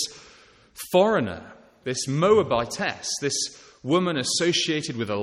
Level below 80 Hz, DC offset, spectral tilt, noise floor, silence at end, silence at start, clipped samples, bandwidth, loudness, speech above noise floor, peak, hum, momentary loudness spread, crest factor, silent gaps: -58 dBFS; under 0.1%; -3.5 dB/octave; -53 dBFS; 0 s; 0 s; under 0.1%; 15.5 kHz; -24 LUFS; 30 dB; -6 dBFS; none; 12 LU; 18 dB; none